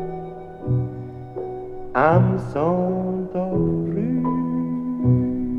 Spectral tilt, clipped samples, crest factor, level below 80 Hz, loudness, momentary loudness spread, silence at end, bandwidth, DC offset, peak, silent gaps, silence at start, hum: -10.5 dB/octave; under 0.1%; 20 dB; -44 dBFS; -22 LUFS; 15 LU; 0 s; 4.7 kHz; under 0.1%; -2 dBFS; none; 0 s; none